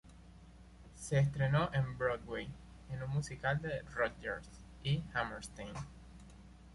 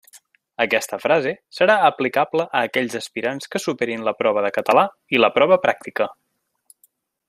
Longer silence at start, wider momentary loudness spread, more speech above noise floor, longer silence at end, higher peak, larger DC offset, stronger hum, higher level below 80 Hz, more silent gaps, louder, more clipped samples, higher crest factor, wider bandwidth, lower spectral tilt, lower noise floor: about the same, 0.05 s vs 0.15 s; first, 23 LU vs 10 LU; second, 20 dB vs 42 dB; second, 0 s vs 1.15 s; second, -20 dBFS vs -2 dBFS; neither; neither; first, -56 dBFS vs -68 dBFS; neither; second, -37 LUFS vs -20 LUFS; neither; about the same, 18 dB vs 18 dB; second, 11.5 kHz vs 15 kHz; first, -6 dB/octave vs -4 dB/octave; second, -57 dBFS vs -62 dBFS